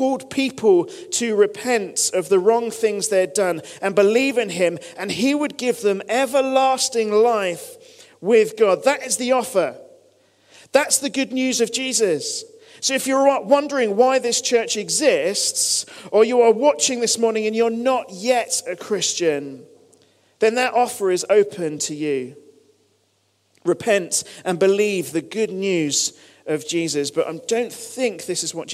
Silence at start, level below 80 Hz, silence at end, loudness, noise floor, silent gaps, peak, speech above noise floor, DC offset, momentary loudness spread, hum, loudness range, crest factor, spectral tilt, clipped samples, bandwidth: 0 s; -72 dBFS; 0 s; -20 LUFS; -65 dBFS; none; -2 dBFS; 45 dB; under 0.1%; 8 LU; none; 5 LU; 18 dB; -2.5 dB/octave; under 0.1%; 15.5 kHz